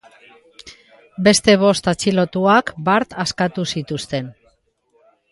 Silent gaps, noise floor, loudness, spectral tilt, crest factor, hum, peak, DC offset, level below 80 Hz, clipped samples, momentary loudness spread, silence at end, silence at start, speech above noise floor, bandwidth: none; -62 dBFS; -17 LUFS; -4.5 dB/octave; 18 dB; none; -2 dBFS; under 0.1%; -52 dBFS; under 0.1%; 12 LU; 1 s; 0.65 s; 45 dB; 11.5 kHz